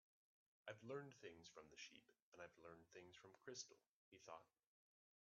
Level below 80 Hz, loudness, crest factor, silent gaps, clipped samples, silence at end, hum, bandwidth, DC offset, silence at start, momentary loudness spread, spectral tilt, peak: under -90 dBFS; -61 LUFS; 24 dB; 2.22-2.32 s, 3.88-4.12 s; under 0.1%; 0.75 s; none; 7.2 kHz; under 0.1%; 0.65 s; 9 LU; -3 dB/octave; -40 dBFS